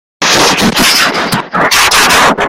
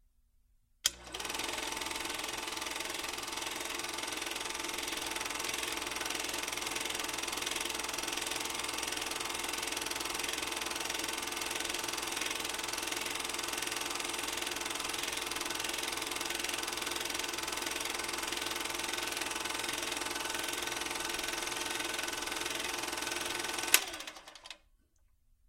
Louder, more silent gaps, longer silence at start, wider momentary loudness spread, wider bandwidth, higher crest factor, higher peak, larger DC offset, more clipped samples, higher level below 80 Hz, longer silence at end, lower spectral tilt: first, -7 LUFS vs -35 LUFS; neither; second, 0.2 s vs 0.85 s; first, 6 LU vs 2 LU; first, over 20 kHz vs 17 kHz; second, 8 dB vs 32 dB; first, 0 dBFS vs -6 dBFS; neither; first, 0.4% vs under 0.1%; first, -34 dBFS vs -62 dBFS; second, 0 s vs 0.9 s; first, -2 dB/octave vs 0 dB/octave